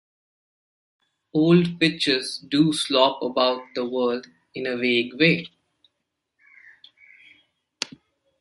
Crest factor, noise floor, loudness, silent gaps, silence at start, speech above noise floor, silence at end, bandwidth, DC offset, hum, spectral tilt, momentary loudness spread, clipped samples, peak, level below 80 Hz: 22 dB; -79 dBFS; -22 LUFS; none; 1.35 s; 58 dB; 0.55 s; 11.5 kHz; under 0.1%; none; -5 dB/octave; 14 LU; under 0.1%; -2 dBFS; -66 dBFS